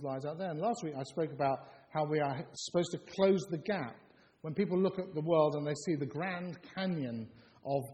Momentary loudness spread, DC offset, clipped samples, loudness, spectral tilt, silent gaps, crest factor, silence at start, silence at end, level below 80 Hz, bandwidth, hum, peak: 11 LU; under 0.1%; under 0.1%; -35 LUFS; -6 dB/octave; none; 20 dB; 0 s; 0 s; -74 dBFS; 13 kHz; none; -16 dBFS